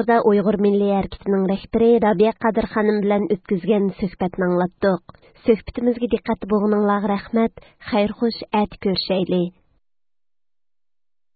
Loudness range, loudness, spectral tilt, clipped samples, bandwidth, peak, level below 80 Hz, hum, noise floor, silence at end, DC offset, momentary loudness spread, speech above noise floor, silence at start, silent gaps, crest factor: 5 LU; -20 LUFS; -11.5 dB/octave; under 0.1%; 4.8 kHz; -4 dBFS; -48 dBFS; none; under -90 dBFS; 1.85 s; under 0.1%; 7 LU; over 71 dB; 0 s; none; 18 dB